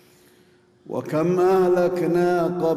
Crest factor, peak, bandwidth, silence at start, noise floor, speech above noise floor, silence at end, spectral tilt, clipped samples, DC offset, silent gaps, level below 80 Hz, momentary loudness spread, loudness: 10 dB; -10 dBFS; 15 kHz; 0.9 s; -56 dBFS; 36 dB; 0 s; -7.5 dB/octave; under 0.1%; under 0.1%; none; -60 dBFS; 10 LU; -20 LUFS